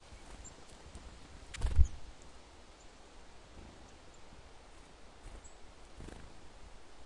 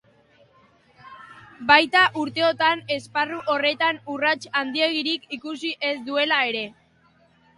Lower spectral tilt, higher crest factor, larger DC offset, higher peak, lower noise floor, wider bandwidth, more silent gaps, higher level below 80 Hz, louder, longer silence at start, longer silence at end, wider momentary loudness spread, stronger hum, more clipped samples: first, -5 dB/octave vs -3.5 dB/octave; about the same, 28 dB vs 24 dB; neither; second, -10 dBFS vs 0 dBFS; about the same, -56 dBFS vs -59 dBFS; about the same, 11 kHz vs 11.5 kHz; neither; first, -42 dBFS vs -66 dBFS; second, -42 LUFS vs -22 LUFS; second, 0 s vs 1.05 s; second, 0 s vs 0.85 s; first, 21 LU vs 12 LU; neither; neither